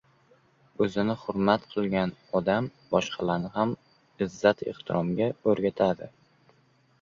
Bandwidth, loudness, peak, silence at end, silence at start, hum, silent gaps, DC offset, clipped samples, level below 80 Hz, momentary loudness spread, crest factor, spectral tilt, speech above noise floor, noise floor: 7.4 kHz; -28 LUFS; -6 dBFS; 0.95 s; 0.8 s; none; none; under 0.1%; under 0.1%; -60 dBFS; 7 LU; 22 dB; -6.5 dB/octave; 37 dB; -64 dBFS